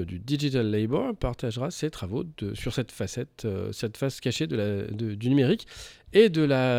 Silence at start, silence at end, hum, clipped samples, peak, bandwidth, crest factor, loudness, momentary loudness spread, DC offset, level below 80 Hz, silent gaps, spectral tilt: 0 s; 0 s; none; under 0.1%; -6 dBFS; 16 kHz; 20 dB; -27 LUFS; 12 LU; under 0.1%; -48 dBFS; none; -6.5 dB/octave